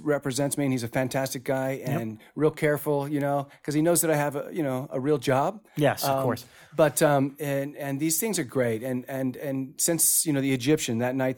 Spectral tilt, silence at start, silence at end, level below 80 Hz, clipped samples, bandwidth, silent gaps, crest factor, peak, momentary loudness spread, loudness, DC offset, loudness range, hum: -4.5 dB/octave; 0 s; 0 s; -64 dBFS; under 0.1%; 19 kHz; none; 18 dB; -8 dBFS; 9 LU; -26 LUFS; under 0.1%; 2 LU; none